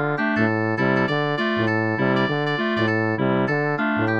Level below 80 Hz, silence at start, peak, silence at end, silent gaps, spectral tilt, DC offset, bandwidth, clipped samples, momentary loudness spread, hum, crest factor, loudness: -60 dBFS; 0 s; -4 dBFS; 0 s; none; -7.5 dB/octave; 0.3%; 7.4 kHz; under 0.1%; 1 LU; none; 16 dB; -21 LUFS